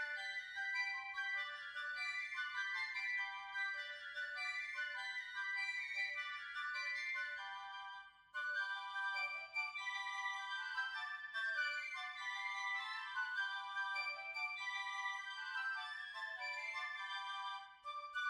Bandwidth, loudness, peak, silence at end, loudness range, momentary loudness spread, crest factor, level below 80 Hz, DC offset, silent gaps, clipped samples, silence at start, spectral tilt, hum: 15.5 kHz; -42 LUFS; -30 dBFS; 0 s; 2 LU; 5 LU; 16 dB; -86 dBFS; under 0.1%; none; under 0.1%; 0 s; 2.5 dB/octave; none